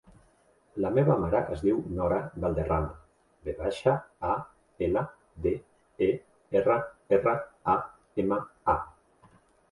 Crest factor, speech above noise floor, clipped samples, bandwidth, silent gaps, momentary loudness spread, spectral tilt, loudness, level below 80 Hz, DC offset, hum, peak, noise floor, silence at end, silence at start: 20 dB; 37 dB; under 0.1%; 11.5 kHz; none; 11 LU; -8.5 dB/octave; -29 LUFS; -48 dBFS; under 0.1%; none; -10 dBFS; -64 dBFS; 0.8 s; 0.75 s